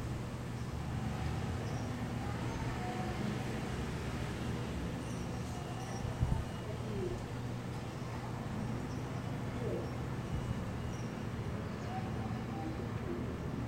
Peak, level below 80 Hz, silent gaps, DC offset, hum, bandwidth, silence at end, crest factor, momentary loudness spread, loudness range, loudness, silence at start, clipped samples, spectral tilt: -18 dBFS; -48 dBFS; none; under 0.1%; none; 16 kHz; 0 s; 20 dB; 3 LU; 1 LU; -40 LUFS; 0 s; under 0.1%; -6.5 dB/octave